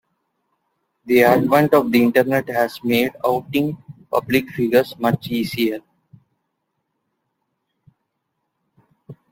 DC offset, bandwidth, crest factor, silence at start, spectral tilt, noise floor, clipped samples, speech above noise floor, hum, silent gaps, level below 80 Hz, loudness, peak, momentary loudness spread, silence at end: under 0.1%; 16.5 kHz; 20 dB; 1.05 s; -6 dB/octave; -75 dBFS; under 0.1%; 58 dB; none; none; -58 dBFS; -18 LUFS; 0 dBFS; 9 LU; 0.2 s